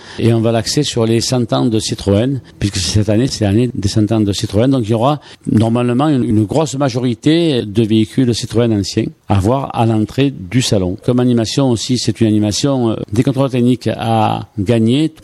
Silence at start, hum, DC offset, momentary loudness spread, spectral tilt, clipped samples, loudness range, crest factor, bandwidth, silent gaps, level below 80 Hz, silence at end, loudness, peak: 0 s; none; under 0.1%; 3 LU; -6 dB/octave; under 0.1%; 1 LU; 14 dB; 13 kHz; none; -42 dBFS; 0.1 s; -14 LUFS; 0 dBFS